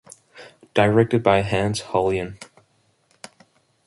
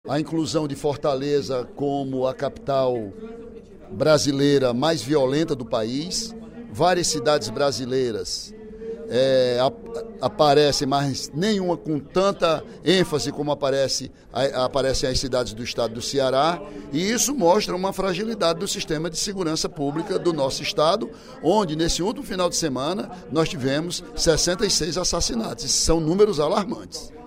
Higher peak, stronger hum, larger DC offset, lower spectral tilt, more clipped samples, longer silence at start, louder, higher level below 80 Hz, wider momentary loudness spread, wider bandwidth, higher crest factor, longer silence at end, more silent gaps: about the same, -2 dBFS vs -4 dBFS; neither; neither; first, -6 dB/octave vs -4 dB/octave; neither; first, 0.35 s vs 0.05 s; about the same, -20 LUFS vs -22 LUFS; second, -48 dBFS vs -42 dBFS; first, 17 LU vs 10 LU; second, 11.5 kHz vs 16 kHz; about the same, 20 dB vs 18 dB; first, 1.45 s vs 0 s; neither